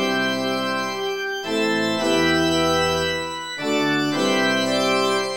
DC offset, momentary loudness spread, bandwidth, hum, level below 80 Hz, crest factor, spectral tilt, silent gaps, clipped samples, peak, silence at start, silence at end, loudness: 0.3%; 6 LU; 17 kHz; none; -50 dBFS; 14 dB; -3.5 dB/octave; none; under 0.1%; -6 dBFS; 0 s; 0 s; -21 LUFS